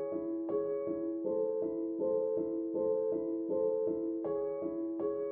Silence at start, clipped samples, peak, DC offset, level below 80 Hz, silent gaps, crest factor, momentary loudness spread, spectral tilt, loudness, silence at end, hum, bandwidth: 0 s; under 0.1%; -22 dBFS; under 0.1%; -74 dBFS; none; 12 dB; 4 LU; -10.5 dB/octave; -35 LUFS; 0 s; none; 2.4 kHz